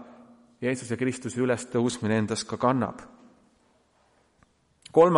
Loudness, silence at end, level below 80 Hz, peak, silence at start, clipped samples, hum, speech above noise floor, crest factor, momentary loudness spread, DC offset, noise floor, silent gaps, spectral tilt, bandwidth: -27 LUFS; 0 s; -66 dBFS; -6 dBFS; 0 s; under 0.1%; none; 38 dB; 22 dB; 6 LU; under 0.1%; -65 dBFS; none; -5.5 dB/octave; 11.5 kHz